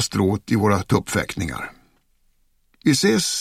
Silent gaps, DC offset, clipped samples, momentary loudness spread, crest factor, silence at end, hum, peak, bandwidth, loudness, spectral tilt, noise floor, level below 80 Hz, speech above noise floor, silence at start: none; under 0.1%; under 0.1%; 11 LU; 18 dB; 0 s; none; -2 dBFS; 16 kHz; -21 LUFS; -4.5 dB/octave; -62 dBFS; -46 dBFS; 42 dB; 0 s